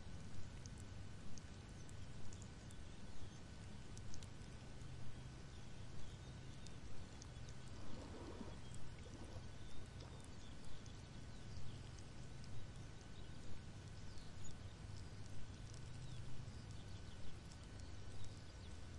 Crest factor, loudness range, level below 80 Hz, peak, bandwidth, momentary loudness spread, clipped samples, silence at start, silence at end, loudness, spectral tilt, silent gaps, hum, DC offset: 14 dB; 1 LU; -60 dBFS; -34 dBFS; 11.5 kHz; 2 LU; under 0.1%; 0 s; 0 s; -56 LUFS; -5 dB/octave; none; none; 0.2%